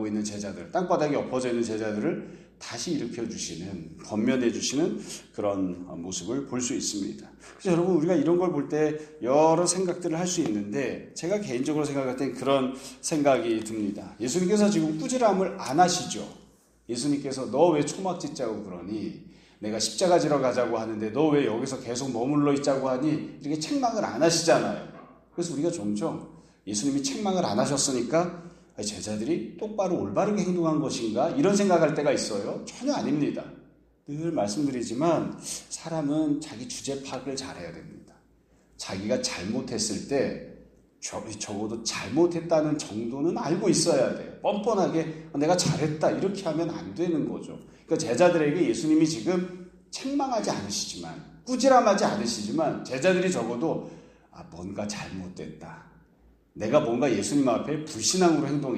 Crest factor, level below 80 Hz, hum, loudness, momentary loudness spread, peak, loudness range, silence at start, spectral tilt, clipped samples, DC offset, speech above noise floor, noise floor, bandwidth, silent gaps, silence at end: 20 dB; -62 dBFS; none; -27 LUFS; 13 LU; -8 dBFS; 5 LU; 0 s; -4.5 dB/octave; under 0.1%; under 0.1%; 35 dB; -61 dBFS; 13.5 kHz; none; 0 s